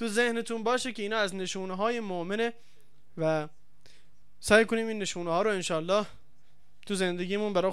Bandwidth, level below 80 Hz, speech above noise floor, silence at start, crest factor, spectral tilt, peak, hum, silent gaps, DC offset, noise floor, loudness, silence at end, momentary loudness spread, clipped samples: 15.5 kHz; -62 dBFS; 39 dB; 0 s; 20 dB; -4 dB/octave; -8 dBFS; none; none; 0.7%; -68 dBFS; -29 LUFS; 0 s; 10 LU; under 0.1%